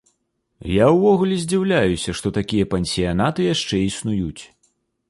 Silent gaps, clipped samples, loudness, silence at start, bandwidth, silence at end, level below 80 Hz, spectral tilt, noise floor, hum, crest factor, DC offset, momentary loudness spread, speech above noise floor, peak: none; under 0.1%; -19 LUFS; 0.65 s; 11.5 kHz; 0.65 s; -42 dBFS; -5.5 dB/octave; -71 dBFS; none; 16 dB; under 0.1%; 9 LU; 52 dB; -4 dBFS